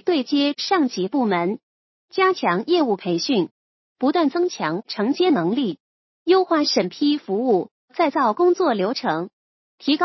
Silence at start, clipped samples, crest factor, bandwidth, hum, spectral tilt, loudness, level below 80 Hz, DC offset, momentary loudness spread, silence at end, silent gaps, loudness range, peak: 0.05 s; under 0.1%; 16 dB; 6.2 kHz; none; -5 dB/octave; -21 LUFS; -78 dBFS; under 0.1%; 9 LU; 0 s; 1.63-2.08 s, 3.51-3.96 s, 5.80-6.26 s, 7.71-7.88 s, 9.33-9.78 s; 2 LU; -6 dBFS